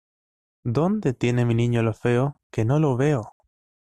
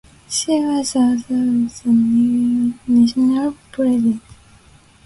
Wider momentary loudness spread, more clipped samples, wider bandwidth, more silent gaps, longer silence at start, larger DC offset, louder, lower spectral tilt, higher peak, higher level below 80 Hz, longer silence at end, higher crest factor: about the same, 6 LU vs 6 LU; neither; second, 9.8 kHz vs 11.5 kHz; first, 2.43-2.50 s vs none; first, 0.65 s vs 0.3 s; neither; second, -23 LUFS vs -17 LUFS; first, -8 dB/octave vs -4.5 dB/octave; second, -10 dBFS vs -6 dBFS; about the same, -52 dBFS vs -52 dBFS; second, 0.5 s vs 0.85 s; about the same, 14 dB vs 12 dB